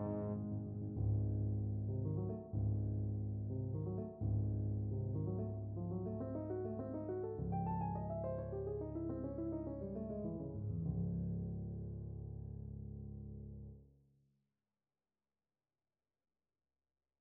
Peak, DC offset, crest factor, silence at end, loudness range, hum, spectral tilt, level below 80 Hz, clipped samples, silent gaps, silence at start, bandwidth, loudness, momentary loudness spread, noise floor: -28 dBFS; under 0.1%; 14 dB; 3.35 s; 12 LU; none; -11 dB/octave; -54 dBFS; under 0.1%; none; 0 s; 2 kHz; -42 LUFS; 10 LU; under -90 dBFS